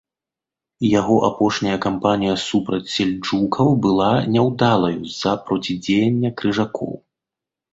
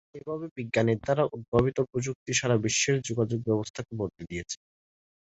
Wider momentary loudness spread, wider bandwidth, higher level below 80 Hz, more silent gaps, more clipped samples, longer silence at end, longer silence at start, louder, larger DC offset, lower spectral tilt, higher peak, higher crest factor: second, 6 LU vs 11 LU; about the same, 8 kHz vs 8.2 kHz; about the same, -52 dBFS vs -52 dBFS; second, none vs 0.51-0.56 s, 1.48-1.52 s, 2.15-2.26 s, 3.70-3.74 s; neither; about the same, 0.75 s vs 0.75 s; first, 0.8 s vs 0.15 s; first, -19 LUFS vs -28 LUFS; neither; first, -6 dB/octave vs -4.5 dB/octave; first, -2 dBFS vs -6 dBFS; about the same, 18 dB vs 22 dB